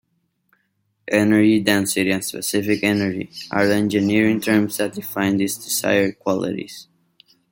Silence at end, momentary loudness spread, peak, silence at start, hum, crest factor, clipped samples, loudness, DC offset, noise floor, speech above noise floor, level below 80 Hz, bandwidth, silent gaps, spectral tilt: 0.7 s; 10 LU; -2 dBFS; 1.05 s; none; 18 dB; under 0.1%; -19 LUFS; under 0.1%; -69 dBFS; 50 dB; -60 dBFS; 17 kHz; none; -4.5 dB/octave